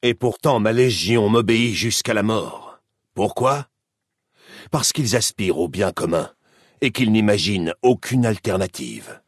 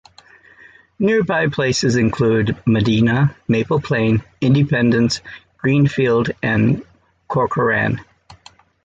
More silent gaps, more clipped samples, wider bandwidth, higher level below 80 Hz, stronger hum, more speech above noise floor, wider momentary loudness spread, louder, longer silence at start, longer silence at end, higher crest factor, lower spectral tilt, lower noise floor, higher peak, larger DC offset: neither; neither; first, 12 kHz vs 8.8 kHz; second, -56 dBFS vs -46 dBFS; neither; first, 60 dB vs 32 dB; first, 10 LU vs 6 LU; second, -20 LUFS vs -17 LUFS; second, 0.05 s vs 1 s; second, 0.1 s vs 0.5 s; about the same, 18 dB vs 14 dB; second, -4.5 dB/octave vs -6.5 dB/octave; first, -79 dBFS vs -48 dBFS; about the same, -4 dBFS vs -4 dBFS; neither